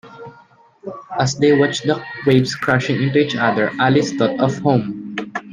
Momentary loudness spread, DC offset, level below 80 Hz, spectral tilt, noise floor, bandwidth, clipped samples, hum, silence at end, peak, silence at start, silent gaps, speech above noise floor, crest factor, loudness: 12 LU; under 0.1%; -56 dBFS; -6 dB/octave; -49 dBFS; 9.8 kHz; under 0.1%; none; 0 s; 0 dBFS; 0.05 s; none; 33 dB; 18 dB; -17 LUFS